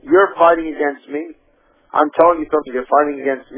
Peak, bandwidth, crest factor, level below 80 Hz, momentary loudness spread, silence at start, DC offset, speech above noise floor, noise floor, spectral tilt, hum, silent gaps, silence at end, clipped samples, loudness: 0 dBFS; 4 kHz; 16 dB; -54 dBFS; 14 LU; 0.05 s; under 0.1%; 40 dB; -56 dBFS; -8.5 dB/octave; none; none; 0 s; under 0.1%; -16 LUFS